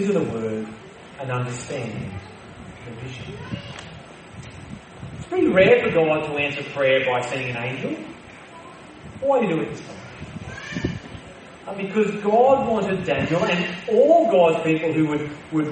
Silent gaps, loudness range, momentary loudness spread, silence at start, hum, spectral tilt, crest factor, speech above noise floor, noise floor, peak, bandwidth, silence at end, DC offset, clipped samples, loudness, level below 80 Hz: none; 13 LU; 24 LU; 0 s; none; -6 dB/octave; 20 dB; 21 dB; -42 dBFS; -2 dBFS; 8.8 kHz; 0 s; under 0.1%; under 0.1%; -21 LUFS; -54 dBFS